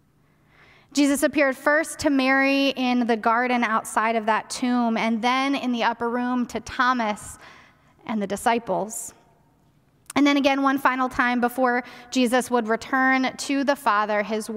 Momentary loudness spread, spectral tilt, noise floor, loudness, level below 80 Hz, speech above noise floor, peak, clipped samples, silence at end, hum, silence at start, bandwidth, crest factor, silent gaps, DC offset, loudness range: 8 LU; -3.5 dB/octave; -61 dBFS; -22 LUFS; -58 dBFS; 38 dB; -4 dBFS; under 0.1%; 0 s; none; 0.95 s; 16 kHz; 18 dB; none; under 0.1%; 5 LU